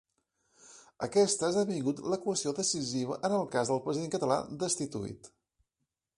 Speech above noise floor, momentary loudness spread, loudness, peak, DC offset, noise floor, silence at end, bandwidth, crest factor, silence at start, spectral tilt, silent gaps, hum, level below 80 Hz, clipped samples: 54 dB; 9 LU; -31 LUFS; -14 dBFS; under 0.1%; -86 dBFS; 0.9 s; 11.5 kHz; 18 dB; 0.65 s; -4 dB/octave; none; none; -68 dBFS; under 0.1%